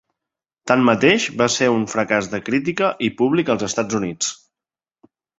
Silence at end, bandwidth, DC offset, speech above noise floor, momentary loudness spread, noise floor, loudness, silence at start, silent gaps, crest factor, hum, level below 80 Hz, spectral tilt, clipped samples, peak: 1.05 s; 8 kHz; under 0.1%; over 72 dB; 8 LU; under -90 dBFS; -19 LUFS; 0.65 s; none; 20 dB; none; -56 dBFS; -4 dB/octave; under 0.1%; 0 dBFS